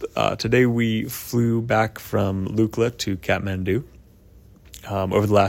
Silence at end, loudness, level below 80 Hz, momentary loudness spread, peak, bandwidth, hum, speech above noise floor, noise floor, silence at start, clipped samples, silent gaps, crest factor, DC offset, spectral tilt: 0 s; -22 LUFS; -48 dBFS; 8 LU; -4 dBFS; 16.5 kHz; none; 28 dB; -49 dBFS; 0 s; under 0.1%; none; 18 dB; under 0.1%; -6 dB/octave